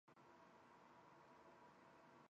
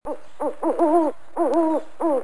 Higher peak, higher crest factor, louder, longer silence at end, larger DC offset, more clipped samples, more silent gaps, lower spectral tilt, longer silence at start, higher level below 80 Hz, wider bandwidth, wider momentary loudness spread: second, -54 dBFS vs -8 dBFS; about the same, 14 dB vs 14 dB; second, -68 LUFS vs -22 LUFS; about the same, 0 s vs 0 s; second, under 0.1% vs 2%; neither; neither; second, -4 dB/octave vs -6.5 dB/octave; about the same, 0.05 s vs 0 s; second, under -90 dBFS vs -58 dBFS; second, 7.6 kHz vs 10.5 kHz; second, 1 LU vs 10 LU